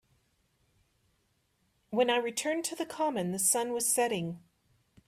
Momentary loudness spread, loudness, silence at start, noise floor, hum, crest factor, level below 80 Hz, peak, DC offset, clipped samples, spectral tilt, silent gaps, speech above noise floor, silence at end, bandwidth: 9 LU; -30 LUFS; 1.9 s; -74 dBFS; none; 20 dB; -74 dBFS; -14 dBFS; under 0.1%; under 0.1%; -3 dB/octave; none; 44 dB; 0.7 s; 15.5 kHz